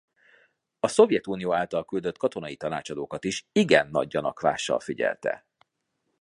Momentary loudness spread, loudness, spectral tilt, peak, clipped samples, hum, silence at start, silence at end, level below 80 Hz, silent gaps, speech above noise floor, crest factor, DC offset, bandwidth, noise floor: 11 LU; -26 LUFS; -4.5 dB/octave; -4 dBFS; under 0.1%; none; 0.85 s; 0.85 s; -64 dBFS; none; 53 dB; 24 dB; under 0.1%; 11 kHz; -78 dBFS